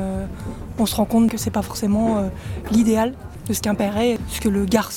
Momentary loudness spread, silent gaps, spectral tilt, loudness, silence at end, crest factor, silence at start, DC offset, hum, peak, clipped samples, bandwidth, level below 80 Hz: 12 LU; none; -5.5 dB/octave; -21 LUFS; 0 s; 16 dB; 0 s; under 0.1%; none; -4 dBFS; under 0.1%; 18.5 kHz; -36 dBFS